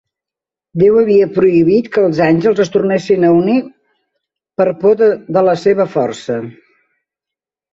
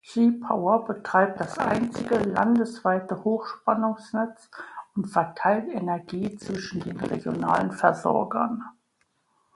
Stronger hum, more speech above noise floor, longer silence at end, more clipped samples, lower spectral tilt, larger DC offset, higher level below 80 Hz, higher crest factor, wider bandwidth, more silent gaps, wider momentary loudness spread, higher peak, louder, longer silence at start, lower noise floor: neither; first, 75 dB vs 46 dB; first, 1.2 s vs 0.85 s; neither; about the same, -7.5 dB/octave vs -7 dB/octave; neither; first, -52 dBFS vs -62 dBFS; second, 12 dB vs 22 dB; second, 7.8 kHz vs 11.5 kHz; neither; about the same, 11 LU vs 10 LU; about the same, -2 dBFS vs -4 dBFS; first, -13 LUFS vs -26 LUFS; first, 0.75 s vs 0.05 s; first, -87 dBFS vs -71 dBFS